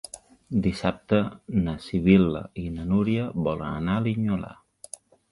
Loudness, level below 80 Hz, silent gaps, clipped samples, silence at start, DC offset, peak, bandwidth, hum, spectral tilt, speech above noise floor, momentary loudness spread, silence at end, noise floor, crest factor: -25 LUFS; -44 dBFS; none; under 0.1%; 0.15 s; under 0.1%; -4 dBFS; 11.5 kHz; none; -7.5 dB/octave; 22 dB; 22 LU; 0.8 s; -46 dBFS; 20 dB